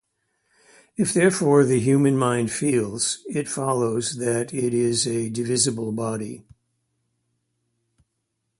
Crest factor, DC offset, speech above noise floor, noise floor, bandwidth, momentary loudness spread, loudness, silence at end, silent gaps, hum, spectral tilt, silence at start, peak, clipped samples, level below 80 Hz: 20 dB; under 0.1%; 55 dB; -77 dBFS; 11.5 kHz; 9 LU; -22 LUFS; 2.2 s; none; none; -4.5 dB/octave; 1 s; -4 dBFS; under 0.1%; -62 dBFS